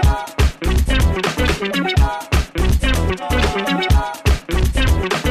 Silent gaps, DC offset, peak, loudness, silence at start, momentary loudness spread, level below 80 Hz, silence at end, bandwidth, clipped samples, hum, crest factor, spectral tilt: none; under 0.1%; -4 dBFS; -18 LUFS; 0 s; 3 LU; -18 dBFS; 0 s; 15 kHz; under 0.1%; none; 12 dB; -5 dB/octave